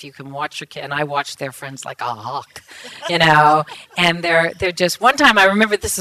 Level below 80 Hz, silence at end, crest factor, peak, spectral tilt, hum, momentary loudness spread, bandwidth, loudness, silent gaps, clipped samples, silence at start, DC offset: -48 dBFS; 0 s; 18 dB; 0 dBFS; -3.5 dB/octave; none; 18 LU; 15.5 kHz; -16 LUFS; none; under 0.1%; 0 s; under 0.1%